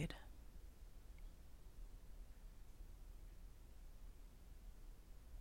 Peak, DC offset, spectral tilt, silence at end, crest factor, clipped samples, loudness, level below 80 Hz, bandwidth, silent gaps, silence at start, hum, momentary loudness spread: -30 dBFS; under 0.1%; -5.5 dB/octave; 0 s; 24 dB; under 0.1%; -62 LUFS; -58 dBFS; 16 kHz; none; 0 s; none; 2 LU